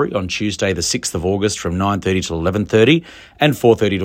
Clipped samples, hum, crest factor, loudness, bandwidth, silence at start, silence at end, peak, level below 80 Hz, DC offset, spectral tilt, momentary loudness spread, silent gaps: under 0.1%; none; 16 dB; -17 LUFS; 16.5 kHz; 0 s; 0 s; 0 dBFS; -44 dBFS; under 0.1%; -4.5 dB/octave; 6 LU; none